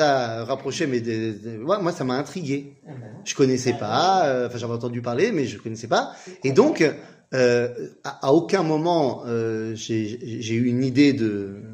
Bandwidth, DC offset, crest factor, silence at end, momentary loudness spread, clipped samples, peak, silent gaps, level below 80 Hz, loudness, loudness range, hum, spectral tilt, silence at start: 10.5 kHz; under 0.1%; 20 dB; 0 s; 12 LU; under 0.1%; -2 dBFS; none; -64 dBFS; -23 LUFS; 4 LU; none; -5.5 dB/octave; 0 s